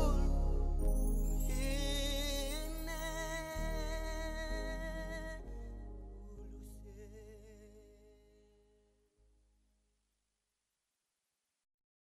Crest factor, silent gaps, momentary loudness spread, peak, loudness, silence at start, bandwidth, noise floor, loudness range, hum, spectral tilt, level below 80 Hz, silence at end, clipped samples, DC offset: 18 dB; none; 18 LU; -22 dBFS; -40 LUFS; 0 s; 16 kHz; -88 dBFS; 19 LU; none; -4.5 dB/octave; -40 dBFS; 4.05 s; under 0.1%; under 0.1%